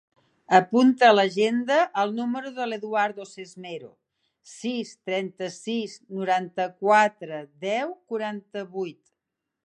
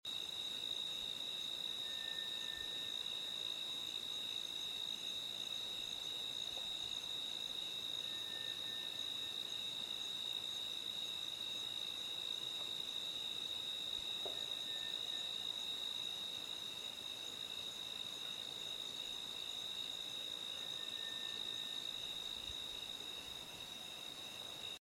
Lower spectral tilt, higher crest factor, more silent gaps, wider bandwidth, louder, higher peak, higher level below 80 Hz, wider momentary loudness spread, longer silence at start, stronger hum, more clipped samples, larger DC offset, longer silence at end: first, -4.5 dB/octave vs -0.5 dB/octave; first, 24 dB vs 14 dB; neither; second, 9.8 kHz vs 17 kHz; first, -24 LUFS vs -42 LUFS; first, -2 dBFS vs -32 dBFS; about the same, -80 dBFS vs -76 dBFS; first, 19 LU vs 3 LU; first, 0.5 s vs 0.05 s; neither; neither; neither; first, 0.75 s vs 0 s